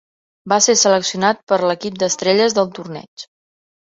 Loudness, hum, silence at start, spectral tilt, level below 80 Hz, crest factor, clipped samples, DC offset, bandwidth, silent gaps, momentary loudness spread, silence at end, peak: -16 LUFS; none; 0.45 s; -2.5 dB/octave; -62 dBFS; 16 dB; under 0.1%; under 0.1%; 8 kHz; 1.43-1.47 s, 3.08-3.17 s; 19 LU; 0.7 s; -2 dBFS